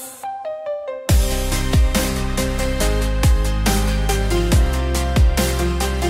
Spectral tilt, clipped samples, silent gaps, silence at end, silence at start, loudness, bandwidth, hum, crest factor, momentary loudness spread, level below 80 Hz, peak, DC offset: -5 dB/octave; under 0.1%; none; 0 s; 0 s; -20 LUFS; 16.5 kHz; none; 14 dB; 9 LU; -20 dBFS; -4 dBFS; under 0.1%